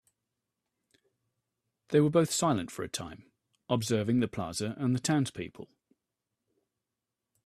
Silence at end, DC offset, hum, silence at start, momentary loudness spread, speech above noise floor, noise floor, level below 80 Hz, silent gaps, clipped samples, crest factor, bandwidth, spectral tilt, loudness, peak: 1.8 s; under 0.1%; none; 1.9 s; 12 LU; 59 dB; -88 dBFS; -68 dBFS; none; under 0.1%; 20 dB; 14 kHz; -5.5 dB/octave; -30 LUFS; -12 dBFS